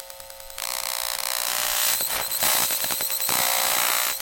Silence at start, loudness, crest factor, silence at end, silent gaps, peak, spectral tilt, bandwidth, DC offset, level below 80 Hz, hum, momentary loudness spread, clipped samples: 0 s; -22 LUFS; 20 dB; 0 s; none; -6 dBFS; 1 dB/octave; 17.5 kHz; under 0.1%; -56 dBFS; none; 10 LU; under 0.1%